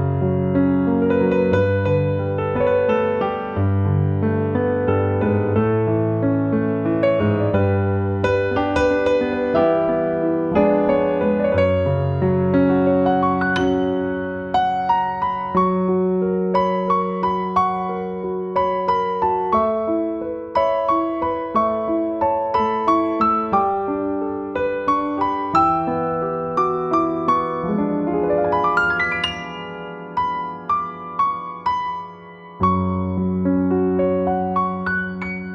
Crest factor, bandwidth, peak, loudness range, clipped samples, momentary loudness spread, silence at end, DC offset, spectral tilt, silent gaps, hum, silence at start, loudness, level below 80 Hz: 16 dB; 7.4 kHz; -4 dBFS; 3 LU; under 0.1%; 6 LU; 0 s; under 0.1%; -8.5 dB/octave; none; none; 0 s; -20 LUFS; -46 dBFS